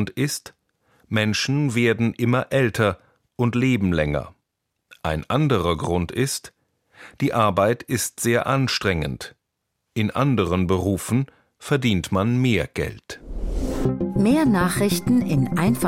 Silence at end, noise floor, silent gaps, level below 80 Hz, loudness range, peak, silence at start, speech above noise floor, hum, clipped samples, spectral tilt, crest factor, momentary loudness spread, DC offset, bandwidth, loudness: 0 s; -78 dBFS; none; -40 dBFS; 2 LU; -4 dBFS; 0 s; 57 dB; none; under 0.1%; -5.5 dB/octave; 18 dB; 11 LU; under 0.1%; 16.5 kHz; -22 LUFS